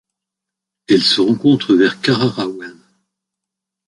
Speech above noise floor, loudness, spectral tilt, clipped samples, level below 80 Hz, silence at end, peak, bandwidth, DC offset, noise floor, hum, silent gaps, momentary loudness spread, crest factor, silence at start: 69 dB; -14 LUFS; -5.5 dB/octave; under 0.1%; -58 dBFS; 1.15 s; -2 dBFS; 11.5 kHz; under 0.1%; -83 dBFS; none; none; 12 LU; 16 dB; 0.9 s